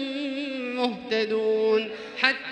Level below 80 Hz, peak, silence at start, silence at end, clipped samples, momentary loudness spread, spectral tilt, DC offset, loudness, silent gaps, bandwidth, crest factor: -72 dBFS; -2 dBFS; 0 s; 0 s; under 0.1%; 7 LU; -4.5 dB/octave; under 0.1%; -26 LUFS; none; 9.4 kHz; 24 dB